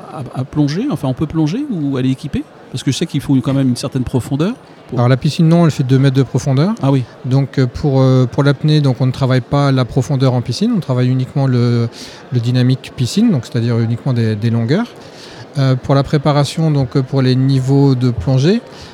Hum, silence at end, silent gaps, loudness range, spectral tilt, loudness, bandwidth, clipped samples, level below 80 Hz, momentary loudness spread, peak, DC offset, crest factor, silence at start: none; 0 s; none; 4 LU; -7.5 dB/octave; -15 LUFS; 11.5 kHz; under 0.1%; -44 dBFS; 7 LU; 0 dBFS; under 0.1%; 14 dB; 0 s